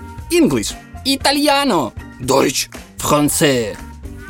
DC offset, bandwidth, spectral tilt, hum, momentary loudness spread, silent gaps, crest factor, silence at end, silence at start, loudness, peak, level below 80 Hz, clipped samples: under 0.1%; 17 kHz; -3.5 dB/octave; none; 12 LU; none; 16 dB; 0 s; 0 s; -16 LUFS; 0 dBFS; -38 dBFS; under 0.1%